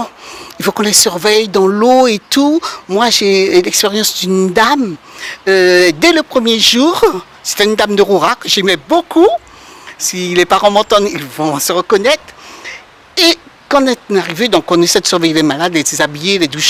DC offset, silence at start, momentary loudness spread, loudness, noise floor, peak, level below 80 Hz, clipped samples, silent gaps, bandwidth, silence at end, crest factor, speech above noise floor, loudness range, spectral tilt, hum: under 0.1%; 0 s; 10 LU; -11 LUFS; -34 dBFS; 0 dBFS; -48 dBFS; 0.4%; none; 19.5 kHz; 0 s; 12 dB; 23 dB; 3 LU; -3 dB/octave; none